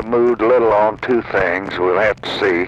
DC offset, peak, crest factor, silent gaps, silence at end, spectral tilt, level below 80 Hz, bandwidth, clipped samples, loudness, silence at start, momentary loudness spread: under 0.1%; -4 dBFS; 12 dB; none; 0 s; -6.5 dB/octave; -44 dBFS; 8 kHz; under 0.1%; -16 LUFS; 0 s; 5 LU